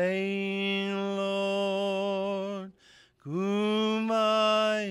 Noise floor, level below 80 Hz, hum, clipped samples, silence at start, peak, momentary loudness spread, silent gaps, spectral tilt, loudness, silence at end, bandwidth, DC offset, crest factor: -59 dBFS; -76 dBFS; none; under 0.1%; 0 s; -16 dBFS; 12 LU; none; -5.5 dB/octave; -28 LUFS; 0 s; 12.5 kHz; under 0.1%; 12 dB